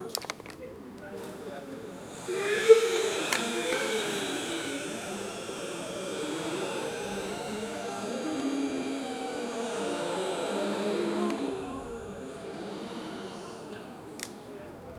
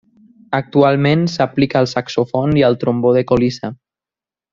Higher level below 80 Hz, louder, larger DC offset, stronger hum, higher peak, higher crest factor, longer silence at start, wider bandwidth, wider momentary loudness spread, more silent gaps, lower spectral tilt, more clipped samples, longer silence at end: second, -64 dBFS vs -46 dBFS; second, -31 LUFS vs -15 LUFS; neither; neither; second, -6 dBFS vs 0 dBFS; first, 26 dB vs 16 dB; second, 0 s vs 0.5 s; first, 17.5 kHz vs 7.6 kHz; first, 13 LU vs 8 LU; neither; second, -3.5 dB/octave vs -7 dB/octave; neither; second, 0 s vs 0.8 s